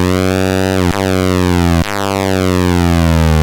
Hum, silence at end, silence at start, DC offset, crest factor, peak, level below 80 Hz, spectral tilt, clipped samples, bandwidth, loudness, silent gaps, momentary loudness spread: none; 0 s; 0 s; under 0.1%; 10 dB; -2 dBFS; -24 dBFS; -6 dB/octave; under 0.1%; 17 kHz; -13 LUFS; none; 3 LU